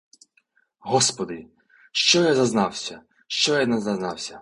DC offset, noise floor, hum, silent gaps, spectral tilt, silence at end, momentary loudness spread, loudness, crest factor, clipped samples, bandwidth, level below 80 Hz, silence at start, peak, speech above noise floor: under 0.1%; -66 dBFS; none; none; -3 dB/octave; 0 s; 15 LU; -22 LUFS; 22 dB; under 0.1%; 11.5 kHz; -62 dBFS; 0.85 s; -2 dBFS; 43 dB